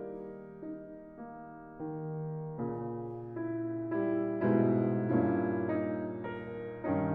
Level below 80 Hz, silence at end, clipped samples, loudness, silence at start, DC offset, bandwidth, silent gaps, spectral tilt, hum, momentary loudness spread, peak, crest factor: -66 dBFS; 0 s; under 0.1%; -34 LUFS; 0 s; under 0.1%; 3.9 kHz; none; -9.5 dB/octave; none; 17 LU; -18 dBFS; 16 dB